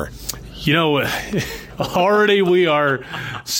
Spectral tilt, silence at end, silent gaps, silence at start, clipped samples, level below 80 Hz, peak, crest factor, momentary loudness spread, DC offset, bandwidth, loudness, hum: -4.5 dB/octave; 0 s; none; 0 s; under 0.1%; -42 dBFS; -4 dBFS; 14 dB; 13 LU; under 0.1%; 17 kHz; -18 LUFS; none